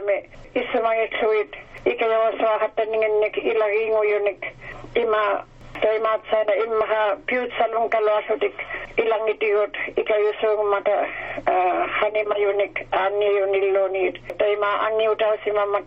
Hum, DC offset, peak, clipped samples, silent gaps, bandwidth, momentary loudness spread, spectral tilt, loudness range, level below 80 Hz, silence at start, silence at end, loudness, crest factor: none; under 0.1%; -6 dBFS; under 0.1%; none; 5.4 kHz; 6 LU; -1 dB/octave; 1 LU; -52 dBFS; 0 s; 0 s; -22 LUFS; 16 dB